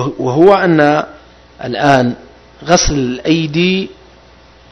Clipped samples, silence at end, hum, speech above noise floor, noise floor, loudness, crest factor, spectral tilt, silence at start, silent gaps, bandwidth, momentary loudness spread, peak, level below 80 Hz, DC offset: 0.5%; 0.8 s; none; 31 dB; -42 dBFS; -12 LUFS; 14 dB; -5 dB/octave; 0 s; none; 8.8 kHz; 19 LU; 0 dBFS; -32 dBFS; under 0.1%